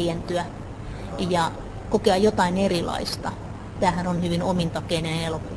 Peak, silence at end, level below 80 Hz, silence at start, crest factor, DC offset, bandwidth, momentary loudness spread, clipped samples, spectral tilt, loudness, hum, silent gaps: -6 dBFS; 0 s; -40 dBFS; 0 s; 18 dB; under 0.1%; 11 kHz; 15 LU; under 0.1%; -5.5 dB/octave; -24 LUFS; none; none